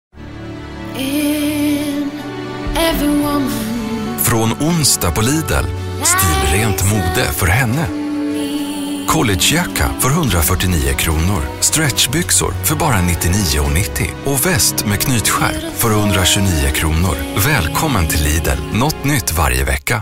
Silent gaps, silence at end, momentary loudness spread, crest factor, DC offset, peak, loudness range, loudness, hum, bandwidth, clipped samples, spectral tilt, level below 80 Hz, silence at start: none; 0 s; 8 LU; 16 dB; under 0.1%; 0 dBFS; 3 LU; -15 LUFS; none; 16.5 kHz; under 0.1%; -4 dB/octave; -26 dBFS; 0.15 s